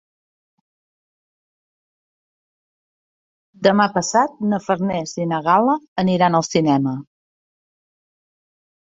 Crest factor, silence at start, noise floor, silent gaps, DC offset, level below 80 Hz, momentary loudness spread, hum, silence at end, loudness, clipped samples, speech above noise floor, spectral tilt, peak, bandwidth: 20 dB; 3.6 s; under -90 dBFS; 5.88-5.96 s; under 0.1%; -62 dBFS; 7 LU; none; 1.8 s; -18 LUFS; under 0.1%; over 72 dB; -5.5 dB/octave; -2 dBFS; 8 kHz